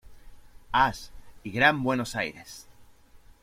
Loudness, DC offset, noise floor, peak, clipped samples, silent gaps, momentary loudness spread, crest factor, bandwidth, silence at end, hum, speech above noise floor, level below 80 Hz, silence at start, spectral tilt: -26 LUFS; under 0.1%; -53 dBFS; -6 dBFS; under 0.1%; none; 23 LU; 24 dB; 16.5 kHz; 0.25 s; none; 27 dB; -50 dBFS; 0.05 s; -4.5 dB/octave